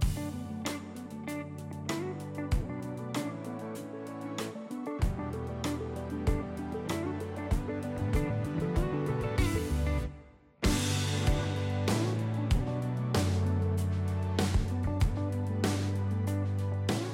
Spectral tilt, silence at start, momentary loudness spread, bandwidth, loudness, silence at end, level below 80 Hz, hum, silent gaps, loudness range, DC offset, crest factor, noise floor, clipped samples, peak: -6 dB/octave; 0 s; 9 LU; 16.5 kHz; -33 LUFS; 0 s; -38 dBFS; none; none; 6 LU; under 0.1%; 16 dB; -53 dBFS; under 0.1%; -16 dBFS